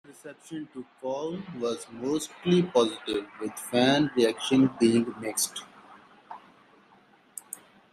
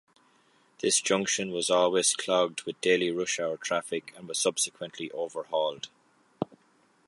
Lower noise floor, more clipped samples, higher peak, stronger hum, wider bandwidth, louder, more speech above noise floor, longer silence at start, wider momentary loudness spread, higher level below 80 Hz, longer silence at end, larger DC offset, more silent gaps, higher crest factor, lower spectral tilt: second, -59 dBFS vs -65 dBFS; neither; about the same, -8 dBFS vs -10 dBFS; neither; first, 15 kHz vs 11.5 kHz; about the same, -27 LUFS vs -28 LUFS; second, 33 dB vs 37 dB; second, 0.1 s vs 0.8 s; first, 21 LU vs 14 LU; first, -68 dBFS vs -76 dBFS; second, 0.35 s vs 0.5 s; neither; neither; about the same, 20 dB vs 20 dB; first, -4.5 dB/octave vs -2 dB/octave